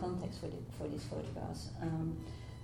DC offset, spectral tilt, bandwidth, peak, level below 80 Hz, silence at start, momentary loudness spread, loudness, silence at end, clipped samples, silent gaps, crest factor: under 0.1%; -7 dB/octave; 14 kHz; -28 dBFS; -54 dBFS; 0 s; 6 LU; -42 LUFS; 0 s; under 0.1%; none; 14 dB